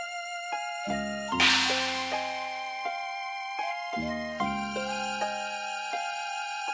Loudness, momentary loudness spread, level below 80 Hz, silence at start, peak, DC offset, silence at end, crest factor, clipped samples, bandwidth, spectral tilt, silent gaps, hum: -30 LUFS; 11 LU; -58 dBFS; 0 s; -10 dBFS; under 0.1%; 0 s; 22 dB; under 0.1%; 8 kHz; -2 dB/octave; none; none